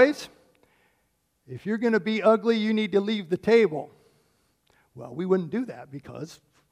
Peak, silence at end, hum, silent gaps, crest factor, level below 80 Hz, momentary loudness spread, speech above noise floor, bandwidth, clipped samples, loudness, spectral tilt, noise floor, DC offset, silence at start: -6 dBFS; 0.35 s; none; none; 20 dB; -70 dBFS; 20 LU; 47 dB; 12 kHz; under 0.1%; -24 LUFS; -6.5 dB/octave; -72 dBFS; under 0.1%; 0 s